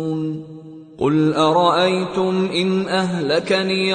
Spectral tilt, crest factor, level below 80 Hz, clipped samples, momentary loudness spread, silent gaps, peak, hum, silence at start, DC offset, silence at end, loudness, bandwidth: -6 dB/octave; 16 dB; -58 dBFS; under 0.1%; 11 LU; none; -2 dBFS; none; 0 s; under 0.1%; 0 s; -18 LUFS; 9.4 kHz